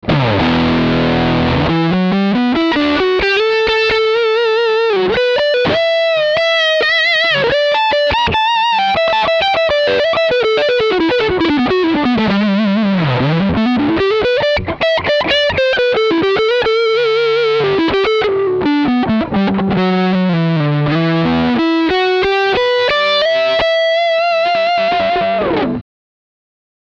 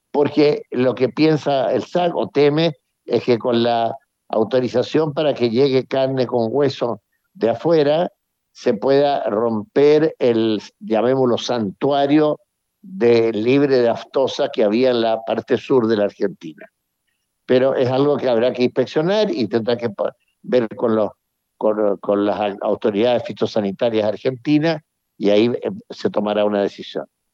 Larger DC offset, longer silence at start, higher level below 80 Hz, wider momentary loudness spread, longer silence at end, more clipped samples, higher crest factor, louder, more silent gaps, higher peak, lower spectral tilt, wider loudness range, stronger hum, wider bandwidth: neither; about the same, 0.05 s vs 0.15 s; first, -38 dBFS vs -70 dBFS; second, 2 LU vs 8 LU; first, 1 s vs 0.3 s; neither; about the same, 12 dB vs 14 dB; first, -13 LUFS vs -18 LUFS; neither; about the same, -2 dBFS vs -4 dBFS; about the same, -6.5 dB/octave vs -7 dB/octave; about the same, 2 LU vs 3 LU; neither; about the same, 8 kHz vs 7.4 kHz